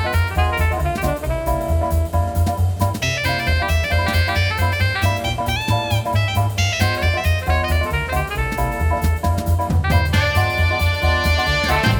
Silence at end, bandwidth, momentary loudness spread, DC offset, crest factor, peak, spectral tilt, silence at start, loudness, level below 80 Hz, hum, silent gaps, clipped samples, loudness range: 0 s; 20 kHz; 4 LU; under 0.1%; 14 dB; -4 dBFS; -5 dB/octave; 0 s; -19 LUFS; -24 dBFS; none; none; under 0.1%; 2 LU